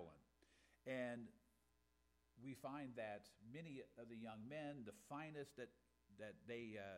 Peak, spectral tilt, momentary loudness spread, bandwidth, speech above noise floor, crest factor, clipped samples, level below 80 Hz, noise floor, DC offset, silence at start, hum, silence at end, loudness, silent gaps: -38 dBFS; -6 dB/octave; 10 LU; 15.5 kHz; 29 dB; 18 dB; under 0.1%; -84 dBFS; -82 dBFS; under 0.1%; 0 s; none; 0 s; -55 LUFS; none